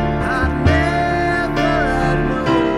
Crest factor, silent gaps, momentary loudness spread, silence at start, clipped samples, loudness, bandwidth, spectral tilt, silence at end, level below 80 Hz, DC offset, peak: 14 dB; none; 3 LU; 0 s; under 0.1%; -17 LUFS; 12.5 kHz; -7 dB/octave; 0 s; -28 dBFS; under 0.1%; -2 dBFS